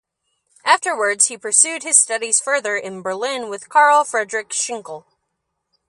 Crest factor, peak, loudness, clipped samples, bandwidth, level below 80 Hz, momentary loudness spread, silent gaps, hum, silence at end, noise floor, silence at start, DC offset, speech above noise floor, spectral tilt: 20 dB; 0 dBFS; -17 LUFS; under 0.1%; 11.5 kHz; -76 dBFS; 13 LU; none; none; 0.9 s; -75 dBFS; 0.65 s; under 0.1%; 57 dB; 0.5 dB/octave